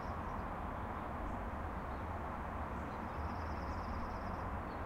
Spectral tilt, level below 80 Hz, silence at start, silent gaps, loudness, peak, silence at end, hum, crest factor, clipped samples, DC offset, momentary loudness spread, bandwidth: -7.5 dB/octave; -48 dBFS; 0 s; none; -43 LUFS; -28 dBFS; 0 s; none; 12 dB; under 0.1%; under 0.1%; 1 LU; 16 kHz